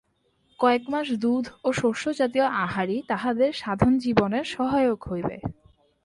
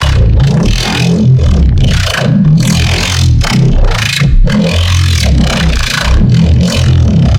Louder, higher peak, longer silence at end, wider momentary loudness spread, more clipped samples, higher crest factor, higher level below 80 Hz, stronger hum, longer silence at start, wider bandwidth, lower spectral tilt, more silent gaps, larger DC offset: second, -25 LUFS vs -9 LUFS; second, -4 dBFS vs 0 dBFS; first, 0.5 s vs 0 s; first, 7 LU vs 3 LU; neither; first, 20 dB vs 8 dB; second, -50 dBFS vs -12 dBFS; neither; first, 0.6 s vs 0 s; second, 11.5 kHz vs 16.5 kHz; about the same, -6 dB/octave vs -5.5 dB/octave; neither; neither